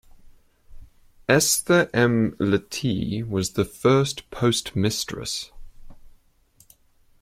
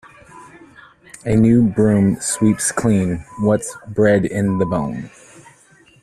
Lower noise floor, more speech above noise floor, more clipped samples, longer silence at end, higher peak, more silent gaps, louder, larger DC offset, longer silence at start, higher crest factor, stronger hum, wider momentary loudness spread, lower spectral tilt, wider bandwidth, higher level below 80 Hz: first, -59 dBFS vs -50 dBFS; about the same, 37 dB vs 34 dB; neither; first, 1.15 s vs 0.95 s; about the same, -2 dBFS vs -4 dBFS; neither; second, -22 LUFS vs -17 LUFS; neither; about the same, 0.25 s vs 0.35 s; first, 22 dB vs 16 dB; neither; about the same, 10 LU vs 12 LU; second, -4.5 dB/octave vs -6.5 dB/octave; first, 16.5 kHz vs 13.5 kHz; second, -50 dBFS vs -44 dBFS